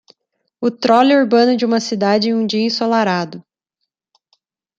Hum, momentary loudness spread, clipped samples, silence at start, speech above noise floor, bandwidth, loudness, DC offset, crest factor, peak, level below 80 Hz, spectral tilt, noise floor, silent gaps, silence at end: none; 10 LU; under 0.1%; 0.6 s; 63 dB; 7.8 kHz; -15 LUFS; under 0.1%; 16 dB; -2 dBFS; -66 dBFS; -5 dB/octave; -77 dBFS; none; 1.4 s